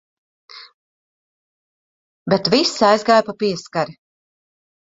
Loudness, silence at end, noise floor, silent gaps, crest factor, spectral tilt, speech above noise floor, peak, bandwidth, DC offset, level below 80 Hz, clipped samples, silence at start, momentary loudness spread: -17 LUFS; 0.9 s; under -90 dBFS; 0.74-2.26 s; 20 dB; -4.5 dB/octave; over 73 dB; 0 dBFS; 8 kHz; under 0.1%; -62 dBFS; under 0.1%; 0.55 s; 10 LU